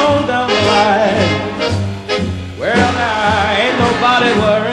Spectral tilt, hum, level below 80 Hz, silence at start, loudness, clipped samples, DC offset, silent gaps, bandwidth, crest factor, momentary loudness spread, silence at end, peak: -5 dB/octave; none; -40 dBFS; 0 s; -13 LUFS; under 0.1%; under 0.1%; none; 11 kHz; 12 dB; 7 LU; 0 s; 0 dBFS